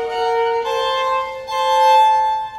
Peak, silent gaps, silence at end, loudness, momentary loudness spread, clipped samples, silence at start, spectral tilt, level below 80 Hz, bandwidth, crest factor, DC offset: -4 dBFS; none; 0 s; -16 LUFS; 9 LU; under 0.1%; 0 s; -1 dB/octave; -54 dBFS; 12 kHz; 12 dB; under 0.1%